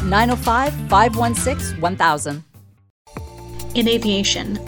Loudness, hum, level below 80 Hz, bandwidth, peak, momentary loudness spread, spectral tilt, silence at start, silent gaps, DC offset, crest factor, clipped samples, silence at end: -18 LUFS; none; -34 dBFS; 19 kHz; -2 dBFS; 20 LU; -4 dB/octave; 0 s; 2.90-3.05 s; under 0.1%; 18 dB; under 0.1%; 0 s